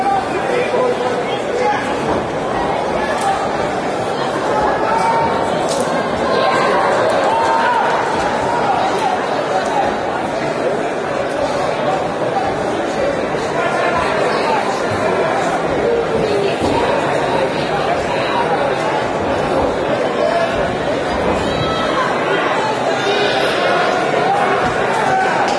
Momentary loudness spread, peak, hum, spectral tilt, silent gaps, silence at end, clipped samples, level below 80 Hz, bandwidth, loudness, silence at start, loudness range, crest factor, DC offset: 4 LU; -2 dBFS; none; -4.5 dB/octave; none; 0 s; under 0.1%; -42 dBFS; 11 kHz; -16 LUFS; 0 s; 3 LU; 14 dB; under 0.1%